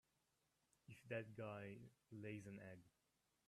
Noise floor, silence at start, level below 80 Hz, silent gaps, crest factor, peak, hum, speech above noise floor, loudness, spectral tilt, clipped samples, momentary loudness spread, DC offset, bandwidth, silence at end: -87 dBFS; 0.9 s; -88 dBFS; none; 22 dB; -36 dBFS; none; 32 dB; -55 LUFS; -7 dB/octave; under 0.1%; 13 LU; under 0.1%; 13 kHz; 0.6 s